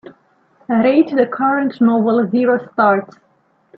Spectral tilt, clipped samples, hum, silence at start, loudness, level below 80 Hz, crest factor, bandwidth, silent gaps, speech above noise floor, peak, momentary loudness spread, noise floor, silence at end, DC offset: -9.5 dB/octave; under 0.1%; none; 0.05 s; -15 LUFS; -64 dBFS; 14 dB; 5.2 kHz; none; 41 dB; -2 dBFS; 3 LU; -56 dBFS; 0.7 s; under 0.1%